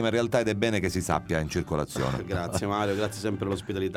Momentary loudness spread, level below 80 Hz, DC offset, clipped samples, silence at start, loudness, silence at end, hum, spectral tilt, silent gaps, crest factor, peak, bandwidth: 5 LU; -46 dBFS; under 0.1%; under 0.1%; 0 s; -28 LUFS; 0 s; none; -5.5 dB/octave; none; 18 dB; -10 dBFS; 16.5 kHz